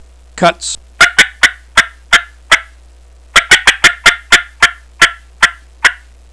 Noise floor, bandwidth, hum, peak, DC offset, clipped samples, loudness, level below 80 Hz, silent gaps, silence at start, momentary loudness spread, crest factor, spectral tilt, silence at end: -40 dBFS; 11 kHz; none; 0 dBFS; 0.4%; 2%; -9 LUFS; -36 dBFS; none; 0.35 s; 6 LU; 12 dB; -0.5 dB/octave; 0.4 s